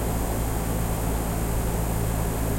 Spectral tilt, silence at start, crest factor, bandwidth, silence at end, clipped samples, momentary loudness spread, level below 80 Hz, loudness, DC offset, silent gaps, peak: -5.5 dB/octave; 0 s; 12 dB; 16 kHz; 0 s; under 0.1%; 1 LU; -28 dBFS; -27 LUFS; under 0.1%; none; -14 dBFS